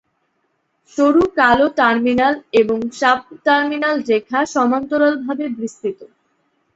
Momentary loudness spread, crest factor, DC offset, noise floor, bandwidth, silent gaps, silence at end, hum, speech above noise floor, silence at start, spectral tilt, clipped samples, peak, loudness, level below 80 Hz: 11 LU; 16 dB; under 0.1%; -67 dBFS; 8 kHz; none; 0.7 s; none; 51 dB; 0.95 s; -4.5 dB/octave; under 0.1%; 0 dBFS; -16 LUFS; -52 dBFS